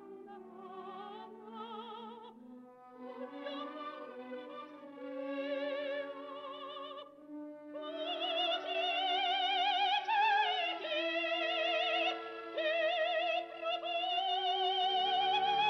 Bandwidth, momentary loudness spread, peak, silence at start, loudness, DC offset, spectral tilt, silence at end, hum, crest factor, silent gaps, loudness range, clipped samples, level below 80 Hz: 7 kHz; 19 LU; -22 dBFS; 0 s; -34 LUFS; under 0.1%; -2.5 dB/octave; 0 s; none; 16 dB; none; 15 LU; under 0.1%; -90 dBFS